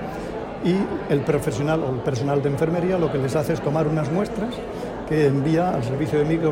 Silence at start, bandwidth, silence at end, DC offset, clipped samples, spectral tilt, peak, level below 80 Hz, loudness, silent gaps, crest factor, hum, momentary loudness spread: 0 s; 16 kHz; 0 s; under 0.1%; under 0.1%; -7.5 dB/octave; -6 dBFS; -44 dBFS; -23 LUFS; none; 16 dB; none; 8 LU